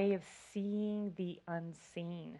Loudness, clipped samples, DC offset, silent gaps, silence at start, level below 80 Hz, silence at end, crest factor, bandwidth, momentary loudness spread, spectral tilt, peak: -41 LUFS; under 0.1%; under 0.1%; none; 0 s; -78 dBFS; 0 s; 18 dB; 11.5 kHz; 9 LU; -7 dB/octave; -22 dBFS